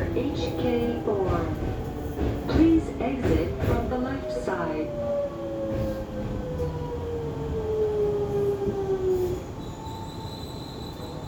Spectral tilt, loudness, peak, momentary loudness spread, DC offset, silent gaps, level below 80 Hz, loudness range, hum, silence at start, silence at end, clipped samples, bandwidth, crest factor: -7.5 dB/octave; -28 LUFS; -8 dBFS; 11 LU; under 0.1%; none; -38 dBFS; 4 LU; none; 0 s; 0 s; under 0.1%; over 20 kHz; 18 dB